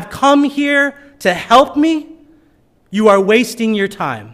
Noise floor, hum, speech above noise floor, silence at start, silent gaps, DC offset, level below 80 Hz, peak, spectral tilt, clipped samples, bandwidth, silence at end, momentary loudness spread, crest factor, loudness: -53 dBFS; none; 40 dB; 0 s; none; under 0.1%; -52 dBFS; 0 dBFS; -4.5 dB/octave; under 0.1%; 15.5 kHz; 0 s; 9 LU; 14 dB; -13 LUFS